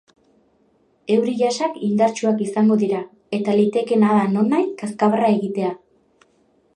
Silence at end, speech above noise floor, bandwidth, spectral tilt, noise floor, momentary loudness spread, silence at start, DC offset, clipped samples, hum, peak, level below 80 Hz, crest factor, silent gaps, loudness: 1 s; 42 dB; 10 kHz; -6.5 dB/octave; -60 dBFS; 9 LU; 1.1 s; under 0.1%; under 0.1%; none; -4 dBFS; -70 dBFS; 16 dB; none; -19 LUFS